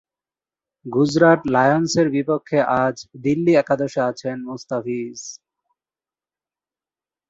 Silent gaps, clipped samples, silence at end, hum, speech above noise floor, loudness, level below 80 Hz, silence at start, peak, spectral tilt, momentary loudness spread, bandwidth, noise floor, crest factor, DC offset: none; under 0.1%; 1.95 s; none; over 71 dB; -19 LUFS; -60 dBFS; 0.85 s; -2 dBFS; -6 dB/octave; 14 LU; 8 kHz; under -90 dBFS; 20 dB; under 0.1%